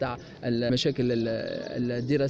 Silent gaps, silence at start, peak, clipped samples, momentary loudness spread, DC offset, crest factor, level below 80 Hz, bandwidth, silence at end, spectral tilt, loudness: none; 0 s; -14 dBFS; under 0.1%; 8 LU; under 0.1%; 14 dB; -54 dBFS; 8.2 kHz; 0 s; -6.5 dB/octave; -28 LUFS